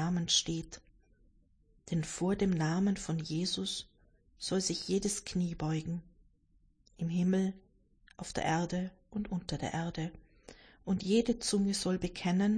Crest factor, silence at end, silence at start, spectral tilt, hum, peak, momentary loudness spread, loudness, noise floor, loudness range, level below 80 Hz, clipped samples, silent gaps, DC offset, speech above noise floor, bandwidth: 18 dB; 0 s; 0 s; -5 dB/octave; none; -16 dBFS; 12 LU; -34 LUFS; -68 dBFS; 3 LU; -56 dBFS; under 0.1%; none; under 0.1%; 36 dB; 10.5 kHz